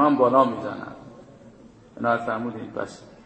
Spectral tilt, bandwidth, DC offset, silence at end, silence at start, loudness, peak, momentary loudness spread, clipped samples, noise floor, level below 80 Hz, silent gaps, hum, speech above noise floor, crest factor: -7 dB/octave; 8.8 kHz; under 0.1%; 0.15 s; 0 s; -24 LUFS; -4 dBFS; 19 LU; under 0.1%; -49 dBFS; -62 dBFS; none; none; 25 dB; 20 dB